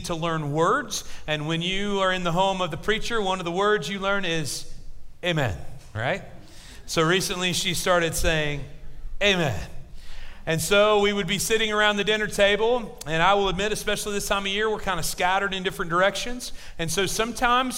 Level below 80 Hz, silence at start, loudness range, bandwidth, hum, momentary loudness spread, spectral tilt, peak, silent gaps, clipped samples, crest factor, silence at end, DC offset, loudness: -40 dBFS; 0 s; 5 LU; 16 kHz; none; 11 LU; -3.5 dB/octave; -6 dBFS; none; under 0.1%; 18 dB; 0 s; under 0.1%; -24 LUFS